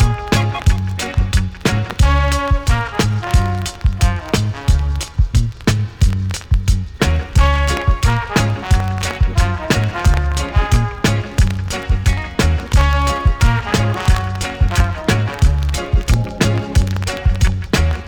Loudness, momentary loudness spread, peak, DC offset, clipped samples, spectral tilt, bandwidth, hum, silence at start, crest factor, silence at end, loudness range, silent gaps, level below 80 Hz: -17 LUFS; 4 LU; -2 dBFS; under 0.1%; under 0.1%; -5.5 dB/octave; 19 kHz; none; 0 s; 12 dB; 0 s; 1 LU; none; -18 dBFS